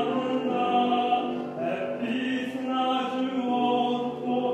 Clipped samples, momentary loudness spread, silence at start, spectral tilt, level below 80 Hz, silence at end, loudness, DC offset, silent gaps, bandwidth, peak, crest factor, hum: under 0.1%; 6 LU; 0 s; -6 dB/octave; -70 dBFS; 0 s; -27 LUFS; under 0.1%; none; 8.6 kHz; -12 dBFS; 14 dB; none